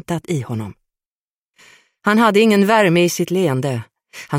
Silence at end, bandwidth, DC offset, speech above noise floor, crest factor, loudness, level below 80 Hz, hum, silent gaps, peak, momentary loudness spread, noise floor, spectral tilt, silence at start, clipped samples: 0 s; 16.5 kHz; under 0.1%; over 74 dB; 16 dB; -16 LUFS; -60 dBFS; none; 1.06-1.50 s; -2 dBFS; 16 LU; under -90 dBFS; -5.5 dB/octave; 0.1 s; under 0.1%